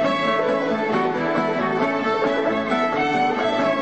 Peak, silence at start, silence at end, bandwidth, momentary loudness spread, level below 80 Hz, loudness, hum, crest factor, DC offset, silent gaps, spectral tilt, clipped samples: -8 dBFS; 0 s; 0 s; 8.4 kHz; 2 LU; -58 dBFS; -21 LUFS; none; 12 dB; 0.2%; none; -5.5 dB/octave; under 0.1%